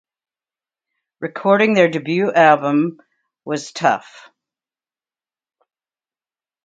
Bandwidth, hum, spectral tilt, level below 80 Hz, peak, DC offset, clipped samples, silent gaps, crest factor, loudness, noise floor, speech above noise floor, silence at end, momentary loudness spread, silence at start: 9.2 kHz; none; -5.5 dB/octave; -70 dBFS; 0 dBFS; under 0.1%; under 0.1%; none; 20 dB; -16 LUFS; under -90 dBFS; over 74 dB; 2.7 s; 14 LU; 1.2 s